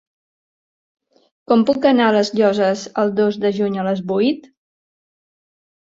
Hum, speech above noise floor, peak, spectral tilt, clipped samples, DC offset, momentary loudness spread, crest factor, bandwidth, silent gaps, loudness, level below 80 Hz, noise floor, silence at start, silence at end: none; over 73 dB; -2 dBFS; -6 dB/octave; under 0.1%; under 0.1%; 6 LU; 16 dB; 7.8 kHz; none; -17 LUFS; -64 dBFS; under -90 dBFS; 1.5 s; 1.45 s